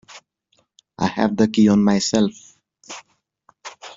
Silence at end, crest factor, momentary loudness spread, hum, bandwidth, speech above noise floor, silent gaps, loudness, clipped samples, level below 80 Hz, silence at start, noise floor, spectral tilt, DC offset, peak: 0.05 s; 18 dB; 23 LU; none; 7.8 kHz; 49 dB; none; -18 LUFS; under 0.1%; -56 dBFS; 0.15 s; -66 dBFS; -5.5 dB/octave; under 0.1%; -4 dBFS